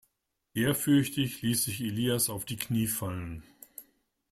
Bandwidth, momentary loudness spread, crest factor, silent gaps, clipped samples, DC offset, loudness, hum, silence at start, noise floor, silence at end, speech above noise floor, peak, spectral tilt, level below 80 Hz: 16 kHz; 21 LU; 18 dB; none; under 0.1%; under 0.1%; -29 LUFS; none; 0.55 s; -80 dBFS; 0.5 s; 51 dB; -12 dBFS; -4.5 dB/octave; -60 dBFS